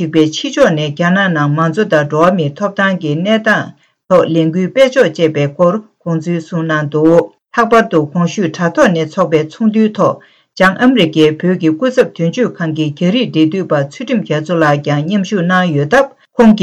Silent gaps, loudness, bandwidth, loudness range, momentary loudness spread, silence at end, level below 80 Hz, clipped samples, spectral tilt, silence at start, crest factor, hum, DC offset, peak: none; -12 LUFS; 10 kHz; 2 LU; 6 LU; 0 s; -52 dBFS; under 0.1%; -6.5 dB/octave; 0 s; 12 dB; none; under 0.1%; 0 dBFS